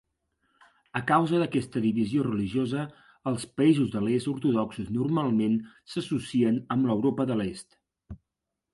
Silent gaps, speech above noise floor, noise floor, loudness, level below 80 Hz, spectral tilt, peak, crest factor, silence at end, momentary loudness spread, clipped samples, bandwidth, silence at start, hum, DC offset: none; 59 dB; -85 dBFS; -27 LUFS; -60 dBFS; -7 dB/octave; -10 dBFS; 18 dB; 0.6 s; 10 LU; under 0.1%; 11.5 kHz; 0.95 s; none; under 0.1%